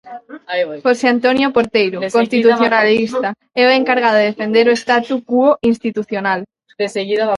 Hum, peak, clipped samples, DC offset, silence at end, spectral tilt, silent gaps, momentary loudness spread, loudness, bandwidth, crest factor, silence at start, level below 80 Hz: none; 0 dBFS; under 0.1%; under 0.1%; 0 s; -5 dB/octave; none; 9 LU; -15 LUFS; 11.5 kHz; 14 dB; 0.05 s; -58 dBFS